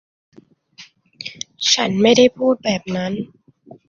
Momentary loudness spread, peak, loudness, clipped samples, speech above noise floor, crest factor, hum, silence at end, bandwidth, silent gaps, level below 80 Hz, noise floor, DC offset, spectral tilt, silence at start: 19 LU; -2 dBFS; -17 LUFS; under 0.1%; 30 dB; 18 dB; none; 0.65 s; 7.4 kHz; none; -60 dBFS; -46 dBFS; under 0.1%; -3.5 dB/octave; 0.8 s